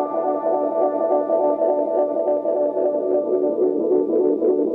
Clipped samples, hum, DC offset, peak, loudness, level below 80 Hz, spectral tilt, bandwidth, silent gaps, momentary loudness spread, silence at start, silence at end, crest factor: under 0.1%; none; under 0.1%; -8 dBFS; -20 LUFS; -70 dBFS; -10.5 dB/octave; 2.7 kHz; none; 2 LU; 0 s; 0 s; 10 dB